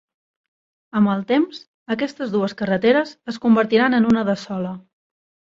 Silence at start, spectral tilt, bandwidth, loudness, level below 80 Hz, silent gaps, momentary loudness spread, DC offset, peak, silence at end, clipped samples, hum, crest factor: 0.95 s; -7 dB/octave; 7.6 kHz; -20 LUFS; -60 dBFS; 1.68-1.86 s; 12 LU; under 0.1%; -2 dBFS; 0.7 s; under 0.1%; none; 18 dB